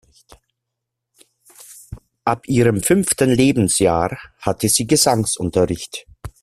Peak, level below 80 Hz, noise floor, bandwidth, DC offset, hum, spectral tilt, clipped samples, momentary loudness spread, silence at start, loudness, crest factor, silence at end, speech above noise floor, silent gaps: 0 dBFS; -46 dBFS; -80 dBFS; 16 kHz; under 0.1%; none; -4.5 dB/octave; under 0.1%; 15 LU; 1.7 s; -17 LUFS; 18 dB; 0.15 s; 63 dB; none